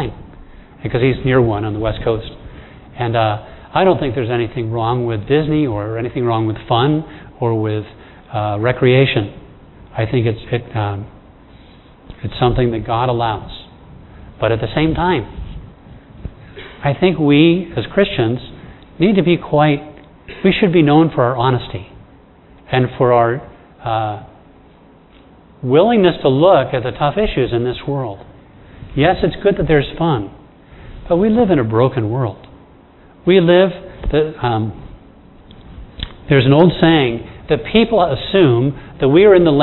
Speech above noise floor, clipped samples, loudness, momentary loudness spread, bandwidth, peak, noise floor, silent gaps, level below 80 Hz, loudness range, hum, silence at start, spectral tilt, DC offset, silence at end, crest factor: 31 dB; under 0.1%; -15 LUFS; 18 LU; 4.2 kHz; 0 dBFS; -45 dBFS; none; -36 dBFS; 5 LU; none; 0 s; -10.5 dB/octave; under 0.1%; 0 s; 16 dB